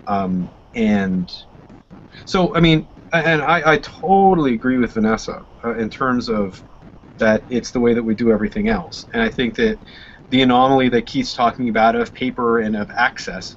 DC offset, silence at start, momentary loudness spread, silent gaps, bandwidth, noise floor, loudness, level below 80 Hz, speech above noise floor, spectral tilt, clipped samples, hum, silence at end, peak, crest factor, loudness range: under 0.1%; 0.05 s; 10 LU; none; 7.8 kHz; -42 dBFS; -18 LUFS; -40 dBFS; 24 dB; -6 dB/octave; under 0.1%; none; 0.05 s; -2 dBFS; 16 dB; 4 LU